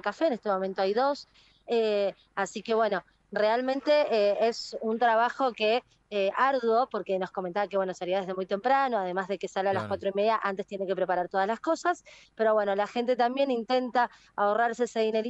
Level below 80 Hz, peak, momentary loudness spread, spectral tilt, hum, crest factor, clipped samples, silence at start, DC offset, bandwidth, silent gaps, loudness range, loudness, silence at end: -72 dBFS; -12 dBFS; 7 LU; -5 dB/octave; none; 16 dB; under 0.1%; 0.05 s; under 0.1%; 8.2 kHz; none; 3 LU; -28 LUFS; 0 s